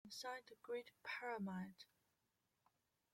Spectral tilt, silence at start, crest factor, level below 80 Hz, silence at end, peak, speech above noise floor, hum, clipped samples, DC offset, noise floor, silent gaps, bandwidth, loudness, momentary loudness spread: -4.5 dB/octave; 0.05 s; 18 dB; under -90 dBFS; 1.3 s; -36 dBFS; 38 dB; none; under 0.1%; under 0.1%; -88 dBFS; none; 16.5 kHz; -50 LUFS; 11 LU